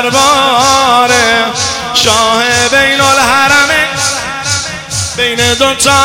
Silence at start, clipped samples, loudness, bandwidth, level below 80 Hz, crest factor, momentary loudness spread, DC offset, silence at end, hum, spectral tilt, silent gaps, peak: 0 s; 0.5%; -8 LUFS; 18 kHz; -38 dBFS; 10 dB; 7 LU; under 0.1%; 0 s; none; -1.5 dB/octave; none; 0 dBFS